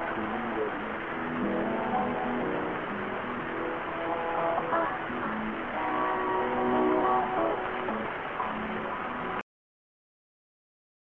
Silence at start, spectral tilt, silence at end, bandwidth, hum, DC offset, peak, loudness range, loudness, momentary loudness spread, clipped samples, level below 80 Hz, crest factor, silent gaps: 0 s; -4 dB/octave; 1.6 s; 6.4 kHz; none; 0.1%; -14 dBFS; 4 LU; -30 LUFS; 7 LU; under 0.1%; -58 dBFS; 16 dB; none